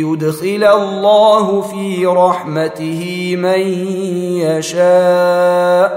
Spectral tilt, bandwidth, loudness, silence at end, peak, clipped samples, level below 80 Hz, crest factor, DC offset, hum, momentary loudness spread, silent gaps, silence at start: -5.5 dB/octave; 16 kHz; -13 LUFS; 0 s; 0 dBFS; under 0.1%; -64 dBFS; 12 dB; under 0.1%; none; 9 LU; none; 0 s